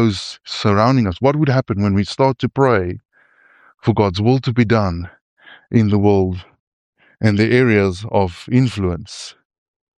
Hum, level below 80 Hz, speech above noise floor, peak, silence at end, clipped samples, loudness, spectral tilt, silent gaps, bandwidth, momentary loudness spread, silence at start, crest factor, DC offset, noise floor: none; -46 dBFS; 37 dB; -2 dBFS; 0.7 s; under 0.1%; -17 LUFS; -7 dB/octave; 5.21-5.37 s, 6.60-6.93 s; 10 kHz; 13 LU; 0 s; 16 dB; under 0.1%; -53 dBFS